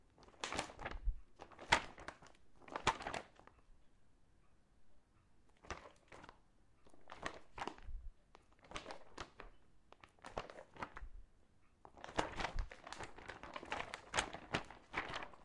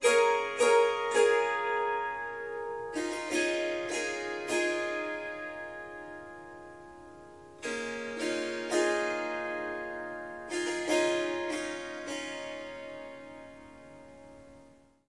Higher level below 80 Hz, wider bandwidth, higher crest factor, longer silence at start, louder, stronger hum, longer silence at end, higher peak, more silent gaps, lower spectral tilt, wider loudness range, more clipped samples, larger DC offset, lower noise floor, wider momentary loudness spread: first, -56 dBFS vs -68 dBFS; about the same, 11.5 kHz vs 11.5 kHz; first, 36 dB vs 20 dB; about the same, 0.05 s vs 0 s; second, -45 LUFS vs -31 LUFS; neither; second, 0 s vs 0.4 s; about the same, -12 dBFS vs -12 dBFS; neither; about the same, -3 dB/octave vs -2 dB/octave; first, 13 LU vs 10 LU; neither; neither; first, -71 dBFS vs -59 dBFS; about the same, 22 LU vs 24 LU